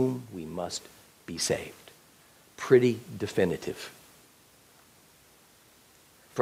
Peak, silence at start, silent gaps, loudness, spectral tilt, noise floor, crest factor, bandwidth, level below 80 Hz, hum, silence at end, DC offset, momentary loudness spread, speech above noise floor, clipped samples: -8 dBFS; 0 s; none; -29 LUFS; -5 dB/octave; -59 dBFS; 24 dB; 16 kHz; -68 dBFS; none; 0 s; under 0.1%; 22 LU; 31 dB; under 0.1%